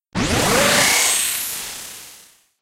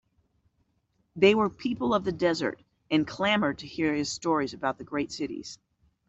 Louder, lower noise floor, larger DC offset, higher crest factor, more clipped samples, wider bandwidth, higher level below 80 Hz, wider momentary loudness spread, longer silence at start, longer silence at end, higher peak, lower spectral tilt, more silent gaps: first, -16 LUFS vs -27 LUFS; second, -48 dBFS vs -73 dBFS; neither; about the same, 16 dB vs 20 dB; neither; first, 16 kHz vs 8.2 kHz; first, -40 dBFS vs -60 dBFS; first, 18 LU vs 12 LU; second, 0.15 s vs 1.15 s; about the same, 0.45 s vs 0.55 s; first, -4 dBFS vs -8 dBFS; second, -1.5 dB/octave vs -5 dB/octave; neither